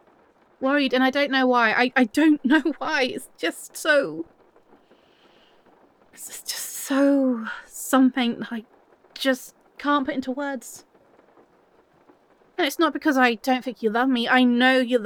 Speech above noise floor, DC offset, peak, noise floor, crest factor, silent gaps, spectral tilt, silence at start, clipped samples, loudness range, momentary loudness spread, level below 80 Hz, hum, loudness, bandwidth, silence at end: 37 dB; under 0.1%; -4 dBFS; -59 dBFS; 18 dB; none; -3 dB/octave; 0.6 s; under 0.1%; 8 LU; 15 LU; -68 dBFS; none; -22 LUFS; 19.5 kHz; 0 s